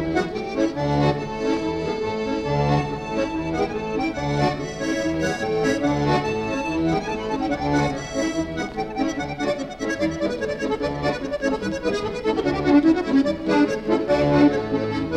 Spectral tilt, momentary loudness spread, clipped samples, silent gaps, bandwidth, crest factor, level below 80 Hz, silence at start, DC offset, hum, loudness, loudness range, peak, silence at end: -6 dB/octave; 7 LU; under 0.1%; none; 11 kHz; 16 dB; -42 dBFS; 0 s; 0.1%; none; -23 LUFS; 5 LU; -6 dBFS; 0 s